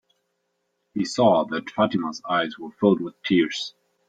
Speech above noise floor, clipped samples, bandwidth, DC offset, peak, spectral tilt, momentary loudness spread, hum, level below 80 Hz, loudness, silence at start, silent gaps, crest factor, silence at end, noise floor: 52 dB; under 0.1%; 9.2 kHz; under 0.1%; -4 dBFS; -5.5 dB/octave; 11 LU; none; -64 dBFS; -23 LUFS; 0.95 s; none; 20 dB; 0.4 s; -75 dBFS